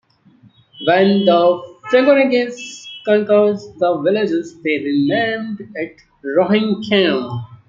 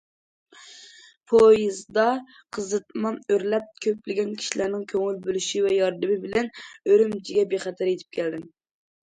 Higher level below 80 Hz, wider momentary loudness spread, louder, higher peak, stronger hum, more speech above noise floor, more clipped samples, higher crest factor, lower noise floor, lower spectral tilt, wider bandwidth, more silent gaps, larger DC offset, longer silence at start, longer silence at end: about the same, -62 dBFS vs -64 dBFS; about the same, 14 LU vs 12 LU; first, -16 LUFS vs -24 LUFS; first, -2 dBFS vs -6 dBFS; neither; first, 35 dB vs 27 dB; neither; about the same, 16 dB vs 18 dB; about the same, -50 dBFS vs -50 dBFS; first, -6 dB/octave vs -4 dB/octave; second, 7.6 kHz vs 9.4 kHz; second, none vs 1.17-1.21 s; neither; first, 0.8 s vs 0.65 s; second, 0.15 s vs 0.6 s